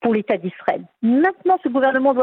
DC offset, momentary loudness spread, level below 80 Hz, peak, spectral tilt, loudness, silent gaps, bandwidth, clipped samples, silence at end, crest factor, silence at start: under 0.1%; 7 LU; -68 dBFS; -4 dBFS; -9 dB/octave; -19 LUFS; none; 4.4 kHz; under 0.1%; 0 s; 14 dB; 0 s